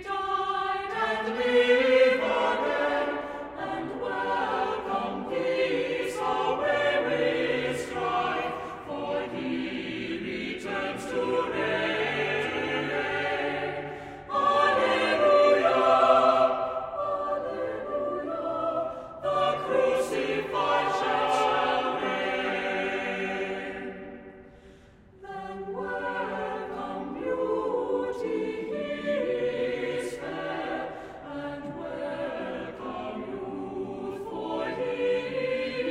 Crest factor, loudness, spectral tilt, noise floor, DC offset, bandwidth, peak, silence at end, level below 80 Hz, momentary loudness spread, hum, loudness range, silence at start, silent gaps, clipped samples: 20 dB; -28 LUFS; -4.5 dB/octave; -53 dBFS; under 0.1%; 12.5 kHz; -8 dBFS; 0 s; -60 dBFS; 14 LU; none; 11 LU; 0 s; none; under 0.1%